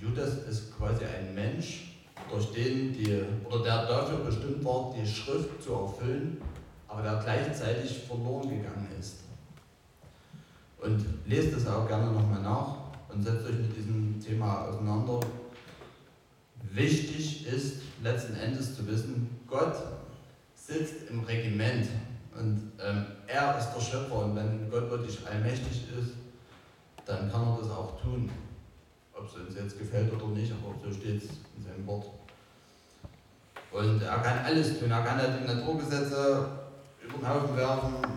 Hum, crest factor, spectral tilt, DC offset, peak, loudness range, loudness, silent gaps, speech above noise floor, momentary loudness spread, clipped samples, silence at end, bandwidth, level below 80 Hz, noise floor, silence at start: none; 18 dB; -6.5 dB/octave; under 0.1%; -14 dBFS; 6 LU; -32 LUFS; none; 30 dB; 16 LU; under 0.1%; 0 s; 16 kHz; -52 dBFS; -61 dBFS; 0 s